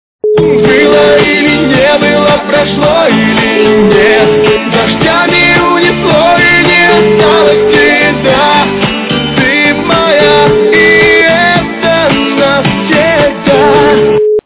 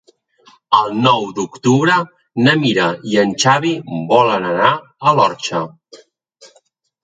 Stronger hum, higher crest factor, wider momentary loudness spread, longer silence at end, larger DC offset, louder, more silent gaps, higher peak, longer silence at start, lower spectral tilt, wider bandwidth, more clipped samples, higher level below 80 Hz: neither; second, 6 dB vs 16 dB; second, 4 LU vs 9 LU; second, 0.05 s vs 1.05 s; neither; first, -6 LUFS vs -15 LUFS; neither; about the same, 0 dBFS vs 0 dBFS; second, 0.25 s vs 0.7 s; first, -9 dB/octave vs -4.5 dB/octave; second, 4 kHz vs 9.4 kHz; first, 0.8% vs under 0.1%; first, -34 dBFS vs -60 dBFS